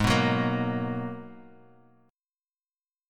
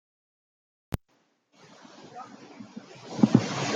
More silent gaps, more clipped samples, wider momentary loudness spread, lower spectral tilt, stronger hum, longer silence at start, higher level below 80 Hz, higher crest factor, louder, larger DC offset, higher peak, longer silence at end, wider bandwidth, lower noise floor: neither; neither; second, 18 LU vs 24 LU; about the same, -6 dB/octave vs -6 dB/octave; neither; second, 0 s vs 2 s; first, -50 dBFS vs -56 dBFS; second, 20 dB vs 26 dB; about the same, -28 LUFS vs -27 LUFS; neither; second, -10 dBFS vs -4 dBFS; first, 1.7 s vs 0 s; about the same, 17 kHz vs 16 kHz; first, under -90 dBFS vs -70 dBFS